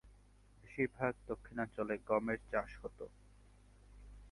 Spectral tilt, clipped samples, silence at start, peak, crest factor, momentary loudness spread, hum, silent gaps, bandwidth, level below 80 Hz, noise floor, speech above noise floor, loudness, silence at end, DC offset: -8 dB/octave; under 0.1%; 0.05 s; -20 dBFS; 22 dB; 18 LU; 50 Hz at -60 dBFS; none; 11.5 kHz; -60 dBFS; -64 dBFS; 25 dB; -40 LUFS; 0 s; under 0.1%